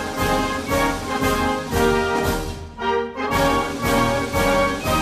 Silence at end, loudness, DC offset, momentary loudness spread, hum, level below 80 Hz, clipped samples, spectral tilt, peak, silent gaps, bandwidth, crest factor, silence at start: 0 s; -21 LUFS; under 0.1%; 5 LU; none; -34 dBFS; under 0.1%; -4.5 dB/octave; -6 dBFS; none; 15 kHz; 14 dB; 0 s